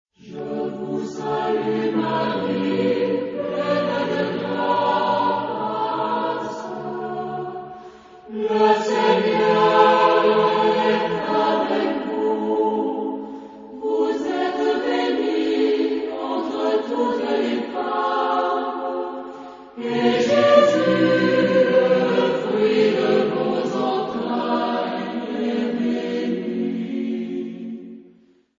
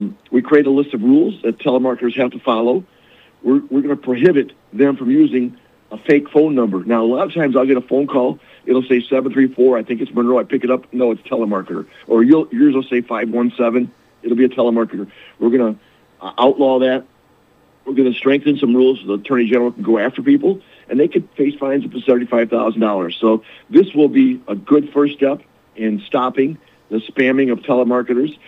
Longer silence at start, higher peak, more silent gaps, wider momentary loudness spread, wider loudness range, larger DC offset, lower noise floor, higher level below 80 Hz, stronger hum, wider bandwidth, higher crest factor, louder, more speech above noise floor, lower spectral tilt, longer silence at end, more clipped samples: first, 0.25 s vs 0 s; about the same, -2 dBFS vs 0 dBFS; neither; first, 13 LU vs 9 LU; first, 6 LU vs 2 LU; neither; about the same, -54 dBFS vs -53 dBFS; about the same, -64 dBFS vs -66 dBFS; neither; first, 7.6 kHz vs 4.3 kHz; about the same, 18 dB vs 16 dB; second, -21 LUFS vs -16 LUFS; second, 32 dB vs 38 dB; second, -6 dB/octave vs -8.5 dB/octave; first, 0.6 s vs 0.15 s; neither